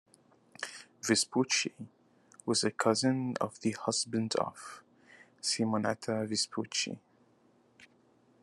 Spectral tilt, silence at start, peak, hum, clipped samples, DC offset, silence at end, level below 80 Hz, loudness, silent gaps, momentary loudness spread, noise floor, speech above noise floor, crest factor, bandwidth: -3.5 dB/octave; 0.6 s; -12 dBFS; none; under 0.1%; under 0.1%; 0.6 s; -80 dBFS; -32 LUFS; none; 15 LU; -67 dBFS; 35 dB; 22 dB; 12.5 kHz